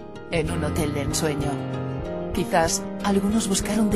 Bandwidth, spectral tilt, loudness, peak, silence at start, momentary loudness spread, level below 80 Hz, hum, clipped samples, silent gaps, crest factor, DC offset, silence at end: 12.5 kHz; -4.5 dB/octave; -24 LUFS; -6 dBFS; 0 s; 7 LU; -40 dBFS; none; under 0.1%; none; 18 dB; under 0.1%; 0 s